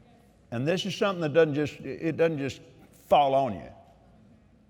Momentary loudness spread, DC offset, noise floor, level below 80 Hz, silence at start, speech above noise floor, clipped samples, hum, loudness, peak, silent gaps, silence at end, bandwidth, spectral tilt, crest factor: 13 LU; under 0.1%; -58 dBFS; -62 dBFS; 0.5 s; 31 dB; under 0.1%; none; -27 LUFS; -8 dBFS; none; 0.95 s; 16.5 kHz; -6 dB/octave; 20 dB